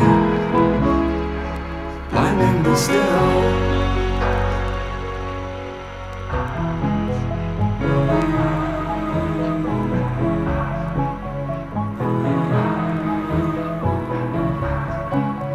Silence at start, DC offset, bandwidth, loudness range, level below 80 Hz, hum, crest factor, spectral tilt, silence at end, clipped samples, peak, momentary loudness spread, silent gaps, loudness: 0 s; under 0.1%; 14.5 kHz; 5 LU; -30 dBFS; none; 18 dB; -7 dB/octave; 0 s; under 0.1%; -2 dBFS; 10 LU; none; -21 LUFS